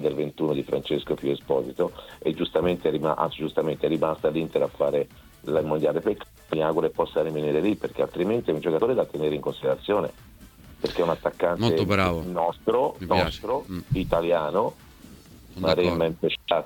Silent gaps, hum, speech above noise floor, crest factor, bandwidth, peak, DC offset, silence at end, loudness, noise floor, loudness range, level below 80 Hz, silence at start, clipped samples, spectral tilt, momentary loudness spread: none; none; 23 dB; 18 dB; 19 kHz; -6 dBFS; under 0.1%; 0 s; -26 LUFS; -48 dBFS; 2 LU; -48 dBFS; 0 s; under 0.1%; -7 dB/octave; 6 LU